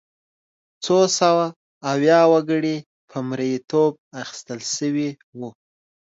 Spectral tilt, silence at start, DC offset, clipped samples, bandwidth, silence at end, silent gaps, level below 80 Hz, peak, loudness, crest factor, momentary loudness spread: -4.5 dB/octave; 0.8 s; under 0.1%; under 0.1%; 8 kHz; 0.65 s; 1.56-1.81 s, 2.86-3.08 s, 3.98-4.11 s, 5.23-5.33 s; -72 dBFS; -4 dBFS; -20 LUFS; 18 dB; 18 LU